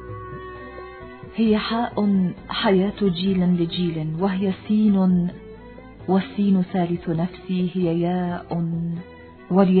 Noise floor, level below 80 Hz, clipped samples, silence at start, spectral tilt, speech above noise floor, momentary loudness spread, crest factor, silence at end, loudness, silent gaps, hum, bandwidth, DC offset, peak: -41 dBFS; -48 dBFS; under 0.1%; 0 s; -11.5 dB/octave; 20 dB; 17 LU; 18 dB; 0 s; -22 LUFS; none; none; 4.5 kHz; under 0.1%; -4 dBFS